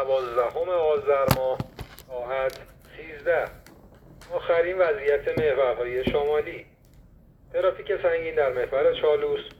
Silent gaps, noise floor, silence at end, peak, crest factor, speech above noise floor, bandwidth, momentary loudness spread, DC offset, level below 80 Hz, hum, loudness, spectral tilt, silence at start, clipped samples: none; -53 dBFS; 0.05 s; -2 dBFS; 24 dB; 28 dB; 18 kHz; 14 LU; under 0.1%; -50 dBFS; none; -25 LUFS; -5.5 dB/octave; 0 s; under 0.1%